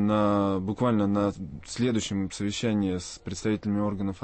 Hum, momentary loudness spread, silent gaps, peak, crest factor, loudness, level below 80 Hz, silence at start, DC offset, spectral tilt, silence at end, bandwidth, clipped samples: none; 8 LU; none; -14 dBFS; 14 dB; -27 LUFS; -52 dBFS; 0 s; under 0.1%; -6 dB/octave; 0 s; 8.8 kHz; under 0.1%